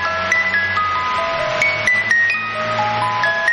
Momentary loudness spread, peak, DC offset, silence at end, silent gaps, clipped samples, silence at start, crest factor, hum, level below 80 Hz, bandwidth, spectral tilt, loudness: 5 LU; -6 dBFS; under 0.1%; 0 s; none; under 0.1%; 0 s; 12 dB; none; -50 dBFS; 12.5 kHz; -3 dB/octave; -16 LUFS